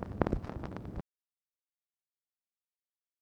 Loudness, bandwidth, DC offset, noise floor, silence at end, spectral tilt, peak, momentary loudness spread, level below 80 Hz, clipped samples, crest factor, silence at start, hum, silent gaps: -39 LUFS; 9.6 kHz; under 0.1%; under -90 dBFS; 2.2 s; -9 dB/octave; -8 dBFS; 13 LU; -48 dBFS; under 0.1%; 34 dB; 0 s; none; none